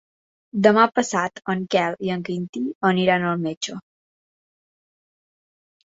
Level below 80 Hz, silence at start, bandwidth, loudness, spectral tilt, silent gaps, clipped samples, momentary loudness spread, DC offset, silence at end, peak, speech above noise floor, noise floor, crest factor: -66 dBFS; 0.55 s; 8 kHz; -21 LUFS; -5 dB/octave; 2.49-2.53 s, 2.75-2.81 s, 3.57-3.61 s; under 0.1%; 12 LU; under 0.1%; 2.15 s; -2 dBFS; over 69 dB; under -90 dBFS; 22 dB